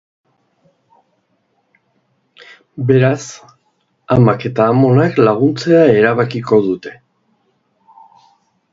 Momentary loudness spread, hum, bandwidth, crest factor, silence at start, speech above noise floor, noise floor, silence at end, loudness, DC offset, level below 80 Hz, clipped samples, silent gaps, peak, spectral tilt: 13 LU; none; 7.8 kHz; 16 dB; 2.75 s; 51 dB; -63 dBFS; 1.8 s; -13 LUFS; under 0.1%; -50 dBFS; under 0.1%; none; 0 dBFS; -7.5 dB/octave